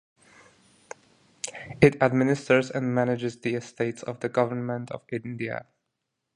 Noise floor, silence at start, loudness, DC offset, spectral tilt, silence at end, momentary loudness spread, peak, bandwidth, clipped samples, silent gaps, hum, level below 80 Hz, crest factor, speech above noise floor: -81 dBFS; 1.45 s; -26 LUFS; under 0.1%; -6.5 dB/octave; 0.75 s; 16 LU; -2 dBFS; 11 kHz; under 0.1%; none; none; -58 dBFS; 24 dB; 56 dB